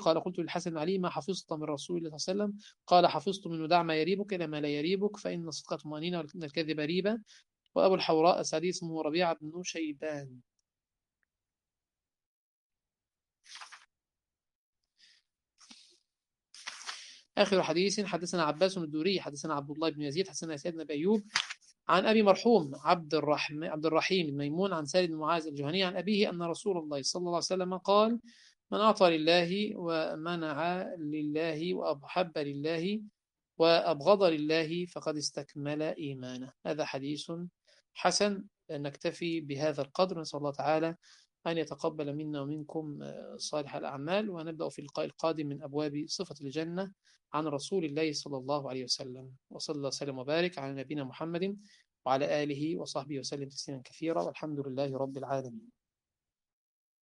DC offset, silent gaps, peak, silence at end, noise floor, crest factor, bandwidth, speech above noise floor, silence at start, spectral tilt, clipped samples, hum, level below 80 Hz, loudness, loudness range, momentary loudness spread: under 0.1%; 12.26-12.70 s, 14.55-14.73 s; -8 dBFS; 1.35 s; under -90 dBFS; 26 dB; 11.5 kHz; over 58 dB; 0 s; -4.5 dB/octave; under 0.1%; none; -78 dBFS; -32 LUFS; 8 LU; 13 LU